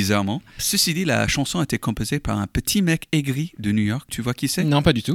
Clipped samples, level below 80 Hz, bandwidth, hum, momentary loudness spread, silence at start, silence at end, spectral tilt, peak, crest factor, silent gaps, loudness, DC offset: under 0.1%; -40 dBFS; 18 kHz; none; 7 LU; 0 s; 0 s; -4.5 dB/octave; -2 dBFS; 18 dB; none; -22 LUFS; under 0.1%